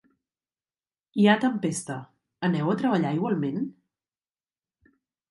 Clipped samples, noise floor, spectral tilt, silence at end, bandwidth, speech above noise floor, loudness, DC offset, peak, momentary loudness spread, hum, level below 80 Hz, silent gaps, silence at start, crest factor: under 0.1%; under -90 dBFS; -6 dB/octave; 1.6 s; 11.5 kHz; over 66 dB; -25 LUFS; under 0.1%; -6 dBFS; 14 LU; none; -74 dBFS; none; 1.15 s; 22 dB